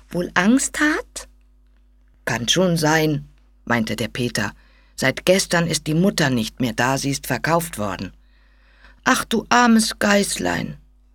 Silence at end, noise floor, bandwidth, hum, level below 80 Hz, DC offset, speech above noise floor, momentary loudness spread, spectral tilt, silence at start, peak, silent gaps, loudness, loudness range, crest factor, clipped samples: 0.35 s; -54 dBFS; 19 kHz; none; -46 dBFS; under 0.1%; 34 dB; 11 LU; -4 dB/octave; 0.1 s; -2 dBFS; none; -19 LUFS; 2 LU; 20 dB; under 0.1%